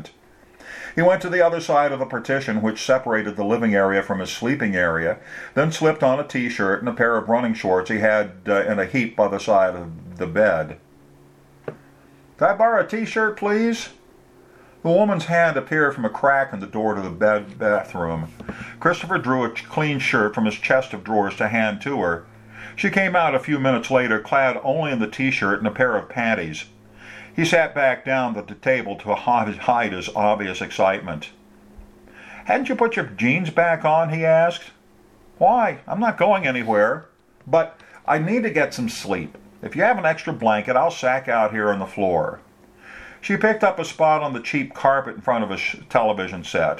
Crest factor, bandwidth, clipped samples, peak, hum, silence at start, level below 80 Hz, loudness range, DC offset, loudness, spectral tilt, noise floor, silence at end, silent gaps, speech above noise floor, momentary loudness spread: 20 dB; 13.5 kHz; under 0.1%; 0 dBFS; none; 0 s; -56 dBFS; 3 LU; under 0.1%; -21 LUFS; -5.5 dB/octave; -52 dBFS; 0 s; none; 32 dB; 10 LU